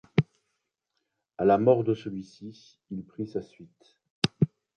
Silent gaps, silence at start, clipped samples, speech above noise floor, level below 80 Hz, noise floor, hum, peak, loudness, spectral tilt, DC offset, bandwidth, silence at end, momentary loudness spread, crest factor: 4.10-4.22 s; 0.15 s; under 0.1%; 53 dB; -62 dBFS; -81 dBFS; none; -2 dBFS; -27 LUFS; -7 dB/octave; under 0.1%; 10.5 kHz; 0.3 s; 19 LU; 26 dB